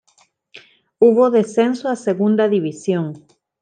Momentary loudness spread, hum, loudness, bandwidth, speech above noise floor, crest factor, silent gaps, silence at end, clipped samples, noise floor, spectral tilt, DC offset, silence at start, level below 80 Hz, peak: 8 LU; none; -17 LUFS; 9.6 kHz; 42 dB; 16 dB; none; 0.45 s; under 0.1%; -59 dBFS; -7 dB/octave; under 0.1%; 0.55 s; -70 dBFS; -2 dBFS